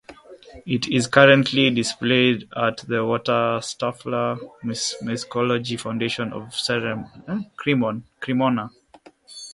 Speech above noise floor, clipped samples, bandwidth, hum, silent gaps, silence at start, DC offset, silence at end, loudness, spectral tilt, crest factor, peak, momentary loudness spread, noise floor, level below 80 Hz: 30 dB; under 0.1%; 11.5 kHz; none; none; 0.1 s; under 0.1%; 0 s; -22 LUFS; -4.5 dB/octave; 22 dB; 0 dBFS; 14 LU; -51 dBFS; -60 dBFS